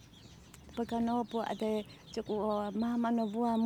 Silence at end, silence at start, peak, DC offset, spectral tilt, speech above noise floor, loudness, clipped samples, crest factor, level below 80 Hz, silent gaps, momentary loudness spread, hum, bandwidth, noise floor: 0 s; 0 s; -20 dBFS; under 0.1%; -6.5 dB/octave; 22 dB; -35 LUFS; under 0.1%; 14 dB; -64 dBFS; none; 20 LU; none; 13 kHz; -55 dBFS